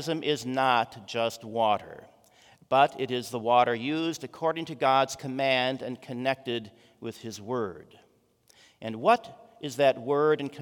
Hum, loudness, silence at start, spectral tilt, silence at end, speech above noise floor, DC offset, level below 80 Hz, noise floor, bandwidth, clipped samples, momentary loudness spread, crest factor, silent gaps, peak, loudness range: none; -27 LUFS; 0 s; -4.5 dB/octave; 0 s; 37 dB; under 0.1%; -74 dBFS; -65 dBFS; 18 kHz; under 0.1%; 14 LU; 20 dB; none; -8 dBFS; 6 LU